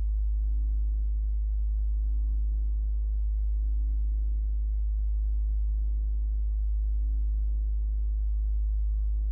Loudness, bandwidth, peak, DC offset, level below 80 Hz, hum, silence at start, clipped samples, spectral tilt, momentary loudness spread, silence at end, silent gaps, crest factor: -31 LUFS; 0.5 kHz; -22 dBFS; under 0.1%; -26 dBFS; none; 0 s; under 0.1%; -15 dB/octave; 1 LU; 0 s; none; 4 dB